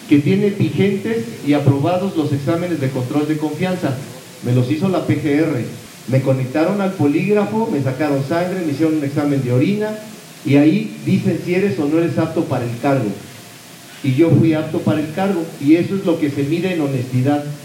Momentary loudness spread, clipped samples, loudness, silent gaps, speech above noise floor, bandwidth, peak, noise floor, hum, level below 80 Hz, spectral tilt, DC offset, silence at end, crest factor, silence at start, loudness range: 9 LU; under 0.1%; -18 LUFS; none; 22 dB; 16.5 kHz; 0 dBFS; -38 dBFS; none; -62 dBFS; -7.5 dB/octave; under 0.1%; 0 s; 16 dB; 0 s; 2 LU